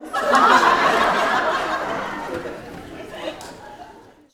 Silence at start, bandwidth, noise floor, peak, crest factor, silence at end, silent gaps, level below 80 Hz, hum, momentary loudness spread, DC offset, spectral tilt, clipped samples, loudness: 0 s; 17.5 kHz; -45 dBFS; 0 dBFS; 20 dB; 0.35 s; none; -52 dBFS; none; 22 LU; under 0.1%; -3 dB/octave; under 0.1%; -18 LUFS